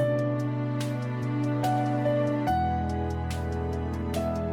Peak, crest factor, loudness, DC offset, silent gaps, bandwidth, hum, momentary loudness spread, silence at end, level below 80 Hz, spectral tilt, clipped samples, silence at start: -16 dBFS; 12 dB; -28 LUFS; under 0.1%; none; 15.5 kHz; none; 5 LU; 0 s; -40 dBFS; -7.5 dB/octave; under 0.1%; 0 s